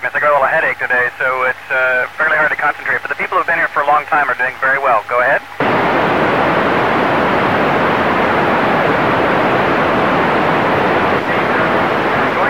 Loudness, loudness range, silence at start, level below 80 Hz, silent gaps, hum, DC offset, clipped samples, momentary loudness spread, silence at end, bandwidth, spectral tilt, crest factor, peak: -14 LUFS; 1 LU; 0 s; -44 dBFS; none; none; 0.7%; under 0.1%; 3 LU; 0 s; 16.5 kHz; -6 dB/octave; 12 dB; -2 dBFS